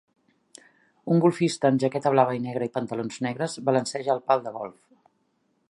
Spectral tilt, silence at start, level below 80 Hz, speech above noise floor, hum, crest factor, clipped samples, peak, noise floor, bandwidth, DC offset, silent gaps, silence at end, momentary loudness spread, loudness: -6 dB/octave; 1.05 s; -74 dBFS; 46 dB; none; 22 dB; under 0.1%; -4 dBFS; -71 dBFS; 11.5 kHz; under 0.1%; none; 1 s; 10 LU; -25 LUFS